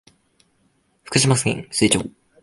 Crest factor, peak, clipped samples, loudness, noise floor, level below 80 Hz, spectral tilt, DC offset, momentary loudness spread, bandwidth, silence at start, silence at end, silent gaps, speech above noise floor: 20 dB; -2 dBFS; under 0.1%; -19 LUFS; -64 dBFS; -50 dBFS; -4 dB/octave; under 0.1%; 6 LU; 11.5 kHz; 1.1 s; 0.35 s; none; 45 dB